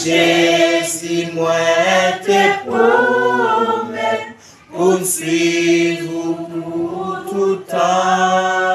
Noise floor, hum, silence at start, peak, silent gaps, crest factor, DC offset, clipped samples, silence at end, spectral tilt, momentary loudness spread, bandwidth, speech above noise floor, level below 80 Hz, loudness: -37 dBFS; none; 0 s; -2 dBFS; none; 14 dB; under 0.1%; under 0.1%; 0 s; -3.5 dB/octave; 10 LU; 14.5 kHz; 23 dB; -64 dBFS; -15 LUFS